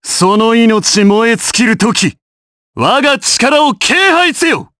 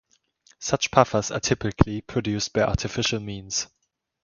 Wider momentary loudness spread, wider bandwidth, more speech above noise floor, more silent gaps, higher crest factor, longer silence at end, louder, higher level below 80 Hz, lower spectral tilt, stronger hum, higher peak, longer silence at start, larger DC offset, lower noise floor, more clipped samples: second, 4 LU vs 8 LU; about the same, 11 kHz vs 10 kHz; first, over 80 dB vs 37 dB; first, 2.22-2.74 s vs none; second, 10 dB vs 26 dB; second, 0.15 s vs 0.6 s; first, -9 LUFS vs -24 LUFS; second, -50 dBFS vs -40 dBFS; second, -3 dB/octave vs -4.5 dB/octave; neither; about the same, 0 dBFS vs 0 dBFS; second, 0.05 s vs 0.6 s; neither; first, under -90 dBFS vs -61 dBFS; neither